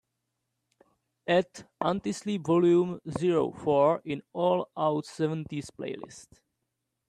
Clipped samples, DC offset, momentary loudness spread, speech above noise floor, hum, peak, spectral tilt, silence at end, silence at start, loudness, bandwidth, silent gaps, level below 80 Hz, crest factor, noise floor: under 0.1%; under 0.1%; 14 LU; 55 dB; none; -10 dBFS; -6.5 dB/octave; 0.85 s; 1.25 s; -28 LUFS; 11 kHz; none; -66 dBFS; 18 dB; -82 dBFS